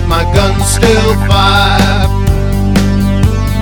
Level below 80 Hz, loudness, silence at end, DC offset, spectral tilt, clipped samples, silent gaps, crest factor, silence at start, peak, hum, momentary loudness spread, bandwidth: -14 dBFS; -10 LUFS; 0 s; under 0.1%; -5 dB/octave; 0.5%; none; 8 dB; 0 s; 0 dBFS; none; 4 LU; 18.5 kHz